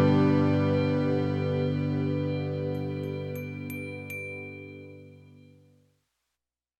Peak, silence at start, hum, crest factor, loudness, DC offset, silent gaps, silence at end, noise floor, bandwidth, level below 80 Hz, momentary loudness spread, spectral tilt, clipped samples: -12 dBFS; 0 s; none; 16 dB; -29 LUFS; under 0.1%; none; 1.55 s; -88 dBFS; 13 kHz; -68 dBFS; 18 LU; -8.5 dB/octave; under 0.1%